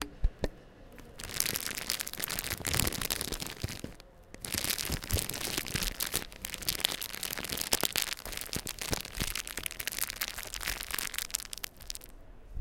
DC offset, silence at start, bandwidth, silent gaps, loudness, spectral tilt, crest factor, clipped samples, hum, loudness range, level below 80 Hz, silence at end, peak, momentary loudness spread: under 0.1%; 0 s; 17 kHz; none; -34 LUFS; -1.5 dB/octave; 32 dB; under 0.1%; none; 3 LU; -44 dBFS; 0 s; -4 dBFS; 13 LU